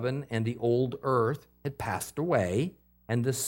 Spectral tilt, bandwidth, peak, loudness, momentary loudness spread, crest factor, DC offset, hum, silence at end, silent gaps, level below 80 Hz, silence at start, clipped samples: -6 dB/octave; 17 kHz; -14 dBFS; -30 LUFS; 9 LU; 16 dB; under 0.1%; none; 0 s; none; -62 dBFS; 0 s; under 0.1%